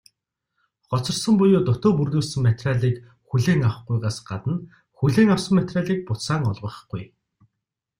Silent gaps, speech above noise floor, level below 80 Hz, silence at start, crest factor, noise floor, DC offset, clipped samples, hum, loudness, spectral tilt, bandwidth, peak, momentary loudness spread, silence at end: none; 62 dB; -54 dBFS; 0.9 s; 16 dB; -82 dBFS; under 0.1%; under 0.1%; none; -22 LUFS; -6.5 dB/octave; 16 kHz; -6 dBFS; 13 LU; 0.95 s